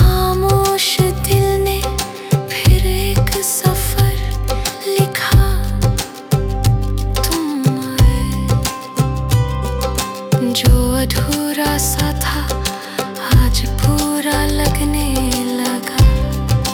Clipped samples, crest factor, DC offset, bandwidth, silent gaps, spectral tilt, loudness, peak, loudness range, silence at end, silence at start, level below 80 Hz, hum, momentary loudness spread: under 0.1%; 14 dB; under 0.1%; over 20 kHz; none; -5 dB/octave; -16 LUFS; -2 dBFS; 2 LU; 0 s; 0 s; -20 dBFS; none; 6 LU